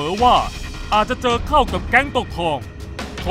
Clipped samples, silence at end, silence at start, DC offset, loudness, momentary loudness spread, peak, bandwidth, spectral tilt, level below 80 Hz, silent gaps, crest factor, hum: under 0.1%; 0 s; 0 s; under 0.1%; -18 LUFS; 15 LU; 0 dBFS; 16 kHz; -4.5 dB/octave; -30 dBFS; none; 18 dB; none